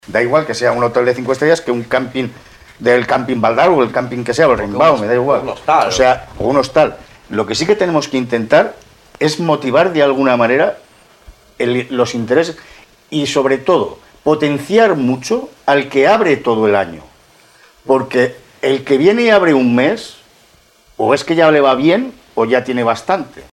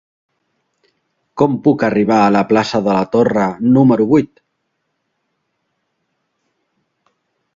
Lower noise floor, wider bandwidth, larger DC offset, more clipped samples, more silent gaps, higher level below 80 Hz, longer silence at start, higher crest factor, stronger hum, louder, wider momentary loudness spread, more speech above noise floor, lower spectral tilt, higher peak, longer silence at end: second, -49 dBFS vs -70 dBFS; first, 13.5 kHz vs 7.6 kHz; neither; neither; neither; first, -46 dBFS vs -54 dBFS; second, 0.1 s vs 1.35 s; about the same, 14 dB vs 16 dB; neither; about the same, -14 LUFS vs -14 LUFS; first, 9 LU vs 5 LU; second, 36 dB vs 58 dB; second, -5 dB/octave vs -7.5 dB/octave; about the same, 0 dBFS vs 0 dBFS; second, 0.1 s vs 3.3 s